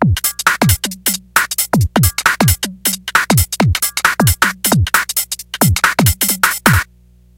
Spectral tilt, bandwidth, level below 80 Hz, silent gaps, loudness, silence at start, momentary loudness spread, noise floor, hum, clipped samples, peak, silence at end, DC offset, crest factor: -3.5 dB/octave; 17.5 kHz; -30 dBFS; none; -13 LUFS; 0 s; 5 LU; -47 dBFS; 60 Hz at -35 dBFS; under 0.1%; 0 dBFS; 0.55 s; under 0.1%; 14 dB